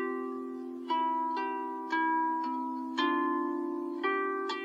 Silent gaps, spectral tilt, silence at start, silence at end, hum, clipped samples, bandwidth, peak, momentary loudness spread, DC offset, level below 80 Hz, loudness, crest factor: none; -3.5 dB/octave; 0 s; 0 s; none; under 0.1%; 8 kHz; -18 dBFS; 7 LU; under 0.1%; under -90 dBFS; -32 LUFS; 16 dB